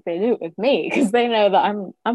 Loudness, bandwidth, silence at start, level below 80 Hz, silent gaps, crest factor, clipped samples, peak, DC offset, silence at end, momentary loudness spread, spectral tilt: -19 LUFS; 12 kHz; 0.05 s; -68 dBFS; none; 14 dB; under 0.1%; -6 dBFS; under 0.1%; 0 s; 6 LU; -5.5 dB/octave